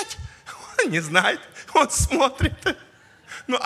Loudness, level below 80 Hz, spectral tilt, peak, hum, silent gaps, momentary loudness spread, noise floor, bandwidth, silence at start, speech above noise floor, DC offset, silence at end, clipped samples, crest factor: -22 LUFS; -36 dBFS; -3.5 dB/octave; 0 dBFS; none; none; 18 LU; -45 dBFS; 16 kHz; 0 s; 24 dB; under 0.1%; 0 s; under 0.1%; 24 dB